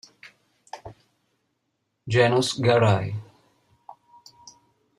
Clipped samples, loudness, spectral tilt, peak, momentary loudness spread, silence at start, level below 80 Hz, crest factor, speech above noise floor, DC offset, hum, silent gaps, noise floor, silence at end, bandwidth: under 0.1%; -21 LUFS; -5.5 dB/octave; -6 dBFS; 23 LU; 0.25 s; -62 dBFS; 20 dB; 56 dB; under 0.1%; none; none; -76 dBFS; 1.75 s; 12 kHz